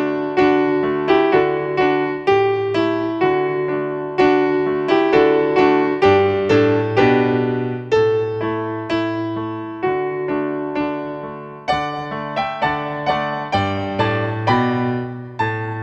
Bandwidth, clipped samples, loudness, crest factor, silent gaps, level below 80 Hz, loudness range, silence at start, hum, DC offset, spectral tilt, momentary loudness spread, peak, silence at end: 7.6 kHz; under 0.1%; -18 LUFS; 16 dB; none; -50 dBFS; 7 LU; 0 s; none; under 0.1%; -7.5 dB/octave; 9 LU; -2 dBFS; 0 s